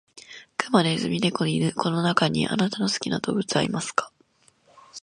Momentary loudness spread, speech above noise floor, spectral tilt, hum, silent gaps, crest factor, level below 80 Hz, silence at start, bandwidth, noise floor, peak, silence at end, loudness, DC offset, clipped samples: 11 LU; 38 dB; -5 dB/octave; none; none; 22 dB; -60 dBFS; 0.15 s; 11.5 kHz; -62 dBFS; -2 dBFS; 0.05 s; -24 LUFS; under 0.1%; under 0.1%